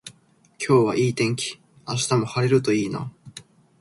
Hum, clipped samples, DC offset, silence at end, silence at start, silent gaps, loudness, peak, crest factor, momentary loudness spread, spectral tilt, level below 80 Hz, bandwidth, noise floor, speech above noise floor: none; under 0.1%; under 0.1%; 0.4 s; 0.05 s; none; -22 LUFS; -6 dBFS; 18 dB; 23 LU; -5.5 dB/octave; -60 dBFS; 11.5 kHz; -57 dBFS; 36 dB